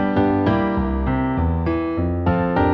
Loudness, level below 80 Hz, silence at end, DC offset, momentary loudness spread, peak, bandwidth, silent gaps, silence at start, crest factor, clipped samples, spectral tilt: -20 LUFS; -30 dBFS; 0 s; under 0.1%; 4 LU; -6 dBFS; 5.6 kHz; none; 0 s; 12 dB; under 0.1%; -10.5 dB/octave